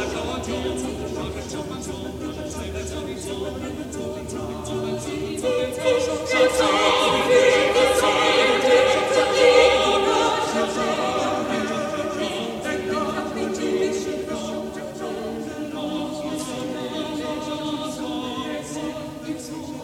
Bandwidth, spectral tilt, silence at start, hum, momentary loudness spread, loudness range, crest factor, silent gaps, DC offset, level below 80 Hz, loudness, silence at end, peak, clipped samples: 16 kHz; -3.5 dB/octave; 0 s; none; 14 LU; 12 LU; 20 dB; none; under 0.1%; -46 dBFS; -22 LUFS; 0 s; -2 dBFS; under 0.1%